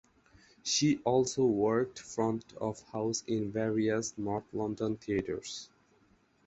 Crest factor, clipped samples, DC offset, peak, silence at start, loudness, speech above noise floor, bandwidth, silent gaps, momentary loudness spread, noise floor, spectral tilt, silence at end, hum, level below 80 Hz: 18 dB; under 0.1%; under 0.1%; -14 dBFS; 0.65 s; -32 LUFS; 36 dB; 8.2 kHz; none; 10 LU; -68 dBFS; -4.5 dB/octave; 0.8 s; none; -64 dBFS